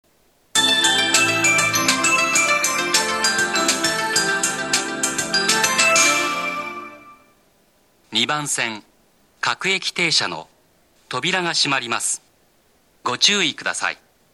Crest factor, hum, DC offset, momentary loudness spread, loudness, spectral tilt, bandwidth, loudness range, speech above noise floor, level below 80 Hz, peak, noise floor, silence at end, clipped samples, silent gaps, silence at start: 20 dB; none; under 0.1%; 11 LU; -18 LUFS; -0.5 dB/octave; 19 kHz; 7 LU; 38 dB; -62 dBFS; -2 dBFS; -59 dBFS; 0.4 s; under 0.1%; none; 0.55 s